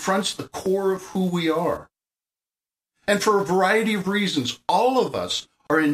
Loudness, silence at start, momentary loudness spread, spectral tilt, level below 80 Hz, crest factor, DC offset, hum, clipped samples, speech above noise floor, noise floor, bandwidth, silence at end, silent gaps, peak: -23 LUFS; 0 s; 8 LU; -4.5 dB/octave; -60 dBFS; 16 dB; under 0.1%; none; under 0.1%; over 68 dB; under -90 dBFS; 15.5 kHz; 0 s; none; -6 dBFS